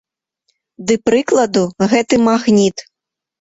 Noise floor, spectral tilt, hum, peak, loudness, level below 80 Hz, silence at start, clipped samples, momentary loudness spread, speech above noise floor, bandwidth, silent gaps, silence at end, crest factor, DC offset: -82 dBFS; -5 dB/octave; none; -2 dBFS; -14 LUFS; -54 dBFS; 0.8 s; under 0.1%; 6 LU; 68 dB; 8 kHz; none; 0.6 s; 14 dB; under 0.1%